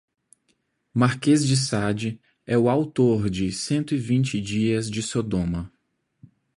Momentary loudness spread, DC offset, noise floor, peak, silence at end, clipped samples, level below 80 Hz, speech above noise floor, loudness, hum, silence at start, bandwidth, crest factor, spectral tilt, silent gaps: 9 LU; under 0.1%; -71 dBFS; -6 dBFS; 0.9 s; under 0.1%; -48 dBFS; 49 dB; -23 LUFS; none; 0.95 s; 11.5 kHz; 18 dB; -5.5 dB/octave; none